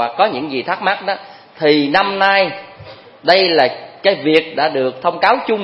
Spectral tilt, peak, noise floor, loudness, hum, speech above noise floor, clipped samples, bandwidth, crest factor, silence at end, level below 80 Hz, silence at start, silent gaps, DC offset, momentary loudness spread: -6 dB/octave; 0 dBFS; -38 dBFS; -15 LUFS; none; 23 dB; under 0.1%; 11 kHz; 16 dB; 0 s; -62 dBFS; 0 s; none; under 0.1%; 9 LU